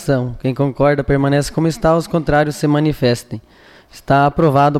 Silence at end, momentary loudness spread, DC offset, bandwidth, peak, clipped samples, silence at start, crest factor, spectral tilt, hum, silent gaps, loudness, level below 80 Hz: 0 s; 6 LU; under 0.1%; 14.5 kHz; -4 dBFS; under 0.1%; 0 s; 12 dB; -7 dB/octave; none; none; -16 LUFS; -36 dBFS